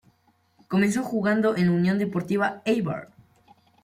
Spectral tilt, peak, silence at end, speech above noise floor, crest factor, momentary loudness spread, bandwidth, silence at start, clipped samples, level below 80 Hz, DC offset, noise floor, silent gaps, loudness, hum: -7 dB/octave; -10 dBFS; 0.8 s; 42 dB; 14 dB; 5 LU; 15 kHz; 0.7 s; under 0.1%; -64 dBFS; under 0.1%; -65 dBFS; none; -24 LUFS; none